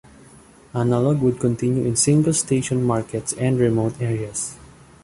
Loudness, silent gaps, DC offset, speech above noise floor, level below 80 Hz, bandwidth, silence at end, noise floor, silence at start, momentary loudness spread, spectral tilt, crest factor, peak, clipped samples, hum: -21 LUFS; none; under 0.1%; 28 dB; -50 dBFS; 11.5 kHz; 0.4 s; -48 dBFS; 0.75 s; 9 LU; -5.5 dB/octave; 16 dB; -4 dBFS; under 0.1%; none